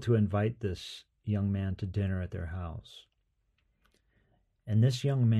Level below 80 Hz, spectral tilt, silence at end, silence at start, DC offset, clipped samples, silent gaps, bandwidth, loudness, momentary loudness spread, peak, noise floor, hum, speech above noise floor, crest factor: -54 dBFS; -7.5 dB/octave; 0 s; 0 s; under 0.1%; under 0.1%; none; 11 kHz; -32 LUFS; 16 LU; -16 dBFS; -76 dBFS; none; 46 dB; 16 dB